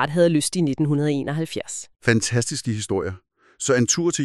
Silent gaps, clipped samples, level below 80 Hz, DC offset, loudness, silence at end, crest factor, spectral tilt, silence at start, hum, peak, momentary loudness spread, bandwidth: none; under 0.1%; -56 dBFS; 0.3%; -22 LUFS; 0 s; 18 dB; -4.5 dB/octave; 0 s; none; -4 dBFS; 10 LU; 13 kHz